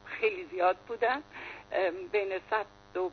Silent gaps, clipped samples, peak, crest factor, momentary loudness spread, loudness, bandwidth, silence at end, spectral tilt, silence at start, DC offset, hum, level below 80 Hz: none; under 0.1%; -16 dBFS; 18 dB; 7 LU; -32 LUFS; 6.6 kHz; 0 s; -5 dB/octave; 0 s; under 0.1%; 50 Hz at -65 dBFS; -68 dBFS